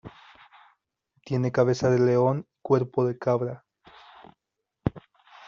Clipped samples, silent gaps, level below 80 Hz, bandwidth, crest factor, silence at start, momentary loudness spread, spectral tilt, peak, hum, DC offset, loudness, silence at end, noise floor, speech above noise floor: under 0.1%; none; -56 dBFS; 7.4 kHz; 20 dB; 0.05 s; 11 LU; -7.5 dB/octave; -8 dBFS; none; under 0.1%; -25 LUFS; 0.5 s; -83 dBFS; 60 dB